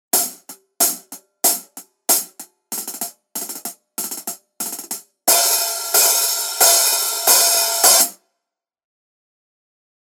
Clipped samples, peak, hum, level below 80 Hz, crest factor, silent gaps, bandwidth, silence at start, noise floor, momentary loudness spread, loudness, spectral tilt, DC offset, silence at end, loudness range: under 0.1%; 0 dBFS; none; -82 dBFS; 20 dB; none; over 20 kHz; 0.15 s; -81 dBFS; 17 LU; -15 LUFS; 2 dB/octave; under 0.1%; 1.9 s; 10 LU